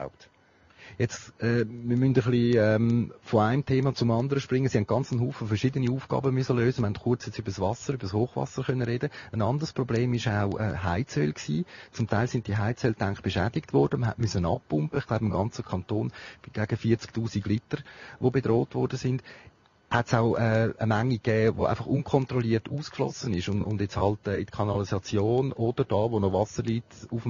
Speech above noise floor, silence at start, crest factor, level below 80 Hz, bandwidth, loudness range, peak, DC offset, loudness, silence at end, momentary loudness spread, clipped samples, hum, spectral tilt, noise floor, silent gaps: 33 dB; 0 s; 20 dB; -54 dBFS; 7.4 kHz; 4 LU; -6 dBFS; under 0.1%; -28 LUFS; 0 s; 7 LU; under 0.1%; none; -7 dB/octave; -60 dBFS; none